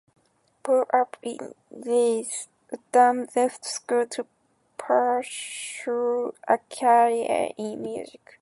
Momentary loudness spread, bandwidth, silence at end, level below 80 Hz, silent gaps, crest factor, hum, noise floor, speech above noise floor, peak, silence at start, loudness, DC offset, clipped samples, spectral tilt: 19 LU; 11.5 kHz; 0.35 s; -76 dBFS; none; 20 dB; none; -45 dBFS; 20 dB; -6 dBFS; 0.65 s; -25 LUFS; under 0.1%; under 0.1%; -3 dB/octave